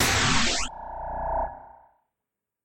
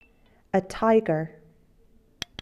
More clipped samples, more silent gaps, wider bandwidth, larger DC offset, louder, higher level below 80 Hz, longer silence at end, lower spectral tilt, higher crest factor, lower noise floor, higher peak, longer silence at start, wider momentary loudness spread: neither; neither; first, 16.5 kHz vs 13.5 kHz; neither; about the same, -26 LUFS vs -24 LUFS; first, -40 dBFS vs -56 dBFS; second, 0 s vs 1.15 s; second, -2.5 dB/octave vs -6 dB/octave; about the same, 18 dB vs 18 dB; first, -87 dBFS vs -59 dBFS; about the same, -10 dBFS vs -10 dBFS; second, 0 s vs 0.55 s; about the same, 15 LU vs 16 LU